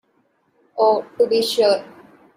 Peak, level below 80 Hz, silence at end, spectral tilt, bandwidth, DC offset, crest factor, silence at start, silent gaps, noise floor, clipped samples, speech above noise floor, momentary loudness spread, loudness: -4 dBFS; -68 dBFS; 0.5 s; -3 dB/octave; 16 kHz; under 0.1%; 16 dB; 0.75 s; none; -64 dBFS; under 0.1%; 47 dB; 5 LU; -18 LUFS